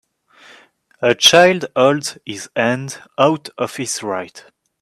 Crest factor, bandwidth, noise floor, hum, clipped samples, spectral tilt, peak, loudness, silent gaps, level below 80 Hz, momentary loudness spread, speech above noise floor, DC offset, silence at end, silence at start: 18 dB; 14 kHz; -50 dBFS; none; under 0.1%; -3 dB/octave; 0 dBFS; -16 LUFS; none; -62 dBFS; 16 LU; 33 dB; under 0.1%; 0.4 s; 1 s